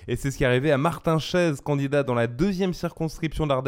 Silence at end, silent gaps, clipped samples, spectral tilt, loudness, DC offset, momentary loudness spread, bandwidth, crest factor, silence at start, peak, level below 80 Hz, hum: 0 s; none; under 0.1%; -6.5 dB/octave; -24 LUFS; under 0.1%; 7 LU; 16.5 kHz; 16 dB; 0 s; -8 dBFS; -42 dBFS; none